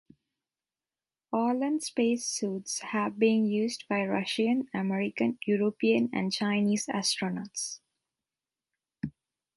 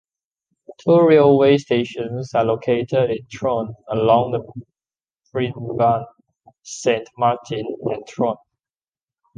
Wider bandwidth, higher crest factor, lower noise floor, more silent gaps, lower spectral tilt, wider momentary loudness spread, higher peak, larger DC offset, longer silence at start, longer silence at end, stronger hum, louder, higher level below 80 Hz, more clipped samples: first, 11.5 kHz vs 9.4 kHz; about the same, 18 dB vs 18 dB; about the same, under -90 dBFS vs under -90 dBFS; neither; second, -4.5 dB/octave vs -6.5 dB/octave; second, 9 LU vs 14 LU; second, -12 dBFS vs -2 dBFS; neither; first, 1.3 s vs 0.7 s; second, 0.45 s vs 1.05 s; neither; second, -29 LUFS vs -19 LUFS; second, -72 dBFS vs -58 dBFS; neither